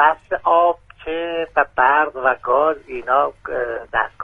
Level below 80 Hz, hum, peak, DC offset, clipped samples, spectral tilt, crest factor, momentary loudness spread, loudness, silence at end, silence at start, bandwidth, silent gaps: -50 dBFS; none; 0 dBFS; under 0.1%; under 0.1%; -6 dB/octave; 18 dB; 10 LU; -19 LUFS; 0 s; 0 s; 4.5 kHz; none